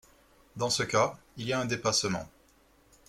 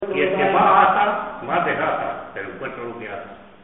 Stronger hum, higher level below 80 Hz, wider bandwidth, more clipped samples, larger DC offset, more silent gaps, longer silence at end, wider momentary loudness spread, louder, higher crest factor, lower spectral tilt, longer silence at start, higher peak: neither; second, -62 dBFS vs -56 dBFS; first, 16 kHz vs 4 kHz; neither; second, under 0.1% vs 0.2%; neither; first, 0.8 s vs 0.2 s; second, 12 LU vs 18 LU; second, -30 LUFS vs -19 LUFS; about the same, 24 dB vs 20 dB; about the same, -3 dB/octave vs -3 dB/octave; first, 0.55 s vs 0 s; second, -10 dBFS vs -2 dBFS